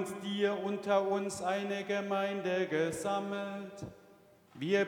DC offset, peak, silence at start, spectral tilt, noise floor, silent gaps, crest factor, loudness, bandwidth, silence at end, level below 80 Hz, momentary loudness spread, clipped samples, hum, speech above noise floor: under 0.1%; -16 dBFS; 0 s; -5 dB/octave; -61 dBFS; none; 18 dB; -34 LUFS; 19.5 kHz; 0 s; -74 dBFS; 10 LU; under 0.1%; none; 28 dB